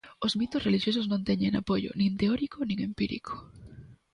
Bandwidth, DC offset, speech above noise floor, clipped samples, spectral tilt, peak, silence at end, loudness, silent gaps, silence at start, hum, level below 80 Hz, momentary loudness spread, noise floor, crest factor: 10 kHz; under 0.1%; 21 dB; under 0.1%; -6.5 dB/octave; -14 dBFS; 0.2 s; -29 LUFS; none; 0.05 s; none; -54 dBFS; 12 LU; -50 dBFS; 16 dB